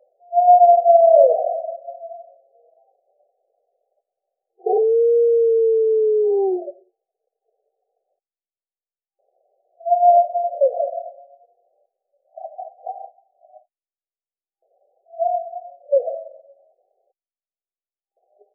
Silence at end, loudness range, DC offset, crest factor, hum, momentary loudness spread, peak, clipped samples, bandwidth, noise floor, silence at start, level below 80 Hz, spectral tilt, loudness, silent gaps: 2.25 s; 19 LU; under 0.1%; 18 dB; none; 24 LU; -2 dBFS; under 0.1%; 0.9 kHz; under -90 dBFS; 0.3 s; under -90 dBFS; 18.5 dB/octave; -17 LUFS; none